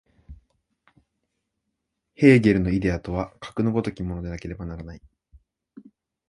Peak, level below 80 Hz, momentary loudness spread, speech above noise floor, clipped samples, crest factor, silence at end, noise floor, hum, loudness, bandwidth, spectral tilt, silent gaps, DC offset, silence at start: -2 dBFS; -44 dBFS; 19 LU; 57 dB; under 0.1%; 22 dB; 0.5 s; -80 dBFS; none; -23 LUFS; 11 kHz; -8 dB/octave; none; under 0.1%; 0.3 s